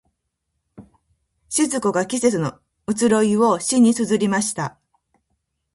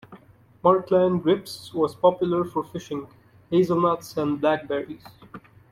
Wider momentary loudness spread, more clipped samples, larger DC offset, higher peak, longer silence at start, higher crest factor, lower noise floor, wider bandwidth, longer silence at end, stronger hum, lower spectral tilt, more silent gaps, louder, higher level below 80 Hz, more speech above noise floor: about the same, 12 LU vs 13 LU; neither; neither; about the same, -4 dBFS vs -6 dBFS; first, 0.8 s vs 0.1 s; about the same, 18 dB vs 18 dB; first, -76 dBFS vs -52 dBFS; second, 11.5 kHz vs 15 kHz; first, 1.05 s vs 0.3 s; neither; second, -4.5 dB/octave vs -7 dB/octave; neither; first, -19 LUFS vs -23 LUFS; about the same, -60 dBFS vs -62 dBFS; first, 57 dB vs 29 dB